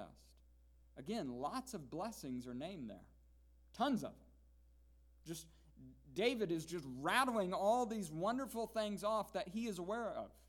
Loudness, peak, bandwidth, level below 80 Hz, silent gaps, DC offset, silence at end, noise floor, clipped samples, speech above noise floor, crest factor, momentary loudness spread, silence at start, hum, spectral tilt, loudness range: -41 LUFS; -20 dBFS; 19 kHz; -68 dBFS; none; under 0.1%; 0.15 s; -67 dBFS; under 0.1%; 26 dB; 24 dB; 16 LU; 0 s; none; -4.5 dB/octave; 9 LU